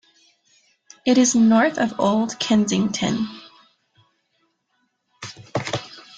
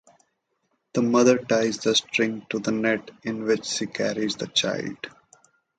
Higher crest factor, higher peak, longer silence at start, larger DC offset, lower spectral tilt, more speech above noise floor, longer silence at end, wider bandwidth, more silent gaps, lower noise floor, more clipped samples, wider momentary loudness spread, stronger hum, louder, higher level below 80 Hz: about the same, 16 dB vs 20 dB; about the same, -6 dBFS vs -4 dBFS; about the same, 1.05 s vs 0.95 s; neither; about the same, -4 dB/octave vs -3.5 dB/octave; about the same, 52 dB vs 50 dB; second, 0.15 s vs 0.7 s; about the same, 9.4 kHz vs 9.4 kHz; neither; second, -70 dBFS vs -74 dBFS; neither; first, 18 LU vs 11 LU; neither; first, -20 LUFS vs -24 LUFS; first, -60 dBFS vs -66 dBFS